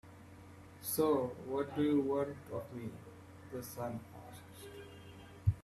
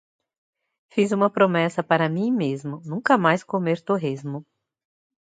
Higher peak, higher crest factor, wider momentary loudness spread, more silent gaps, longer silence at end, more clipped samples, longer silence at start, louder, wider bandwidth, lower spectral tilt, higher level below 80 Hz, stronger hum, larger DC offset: second, -18 dBFS vs -2 dBFS; about the same, 20 dB vs 20 dB; first, 23 LU vs 12 LU; neither; second, 0 s vs 0.9 s; neither; second, 0.05 s vs 0.95 s; second, -37 LUFS vs -22 LUFS; first, 15.5 kHz vs 9.2 kHz; about the same, -6.5 dB/octave vs -7 dB/octave; first, -62 dBFS vs -72 dBFS; neither; neither